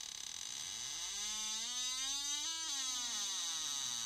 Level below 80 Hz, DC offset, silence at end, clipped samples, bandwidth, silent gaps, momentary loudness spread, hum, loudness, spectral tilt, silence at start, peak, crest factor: -72 dBFS; under 0.1%; 0 s; under 0.1%; 16 kHz; none; 5 LU; none; -38 LUFS; 2.5 dB/octave; 0 s; -28 dBFS; 14 dB